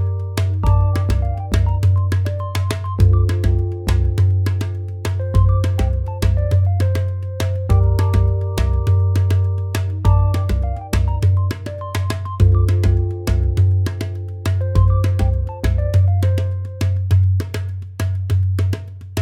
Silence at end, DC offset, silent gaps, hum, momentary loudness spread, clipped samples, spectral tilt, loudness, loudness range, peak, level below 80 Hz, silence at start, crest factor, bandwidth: 0 s; under 0.1%; none; none; 8 LU; under 0.1%; -7 dB/octave; -18 LUFS; 1 LU; -2 dBFS; -24 dBFS; 0 s; 14 dB; 13 kHz